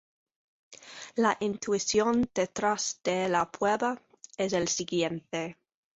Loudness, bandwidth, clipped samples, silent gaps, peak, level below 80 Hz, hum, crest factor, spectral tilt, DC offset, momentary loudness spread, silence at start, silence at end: -29 LUFS; 8.2 kHz; under 0.1%; none; -12 dBFS; -64 dBFS; none; 18 dB; -3.5 dB/octave; under 0.1%; 11 LU; 0.7 s; 0.4 s